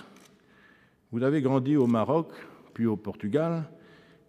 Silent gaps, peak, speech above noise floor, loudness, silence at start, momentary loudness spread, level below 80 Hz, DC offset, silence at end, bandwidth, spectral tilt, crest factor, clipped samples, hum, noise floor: none; -12 dBFS; 34 dB; -27 LUFS; 0 s; 17 LU; -74 dBFS; under 0.1%; 0.55 s; 11.5 kHz; -9 dB/octave; 18 dB; under 0.1%; none; -60 dBFS